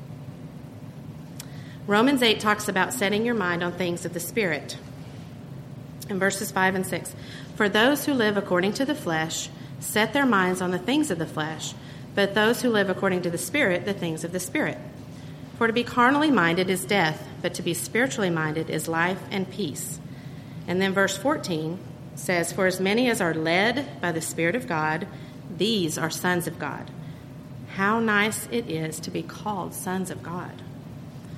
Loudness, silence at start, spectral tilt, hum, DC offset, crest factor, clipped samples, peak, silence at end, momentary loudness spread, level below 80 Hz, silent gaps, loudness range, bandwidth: -25 LUFS; 0 s; -4 dB/octave; none; under 0.1%; 20 dB; under 0.1%; -6 dBFS; 0 s; 19 LU; -58 dBFS; none; 4 LU; 16 kHz